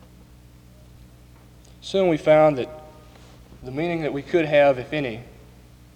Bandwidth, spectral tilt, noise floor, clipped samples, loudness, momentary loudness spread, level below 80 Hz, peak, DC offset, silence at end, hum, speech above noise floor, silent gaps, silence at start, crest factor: 9.6 kHz; -6.5 dB/octave; -48 dBFS; under 0.1%; -21 LUFS; 21 LU; -52 dBFS; -4 dBFS; under 0.1%; 0.7 s; none; 28 dB; none; 1.85 s; 20 dB